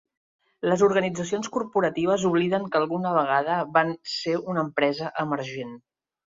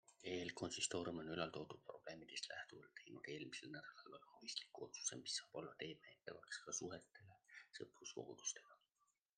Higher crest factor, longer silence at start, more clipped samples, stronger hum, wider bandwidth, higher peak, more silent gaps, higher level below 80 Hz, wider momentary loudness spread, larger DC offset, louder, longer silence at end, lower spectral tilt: about the same, 20 dB vs 24 dB; first, 0.65 s vs 0.1 s; neither; neither; second, 7.8 kHz vs 10.5 kHz; first, -6 dBFS vs -28 dBFS; neither; first, -66 dBFS vs -86 dBFS; second, 8 LU vs 14 LU; neither; first, -25 LUFS vs -50 LUFS; about the same, 0.6 s vs 0.6 s; first, -5.5 dB/octave vs -2.5 dB/octave